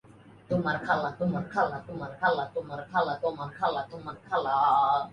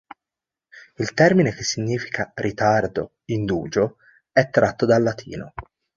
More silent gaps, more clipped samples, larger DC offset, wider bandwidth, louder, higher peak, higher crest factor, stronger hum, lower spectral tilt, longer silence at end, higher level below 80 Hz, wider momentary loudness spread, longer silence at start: neither; neither; neither; first, 10 kHz vs 7.6 kHz; second, -29 LUFS vs -21 LUFS; second, -12 dBFS vs -2 dBFS; about the same, 18 dB vs 20 dB; neither; first, -7 dB/octave vs -5.5 dB/octave; second, 0 s vs 0.35 s; second, -64 dBFS vs -50 dBFS; about the same, 12 LU vs 14 LU; second, 0.5 s vs 0.75 s